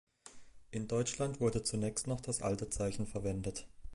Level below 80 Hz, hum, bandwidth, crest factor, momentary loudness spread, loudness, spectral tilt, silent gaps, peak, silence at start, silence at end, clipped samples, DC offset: -54 dBFS; none; 11.5 kHz; 18 dB; 12 LU; -37 LUFS; -5 dB/octave; none; -20 dBFS; 0.25 s; 0 s; under 0.1%; under 0.1%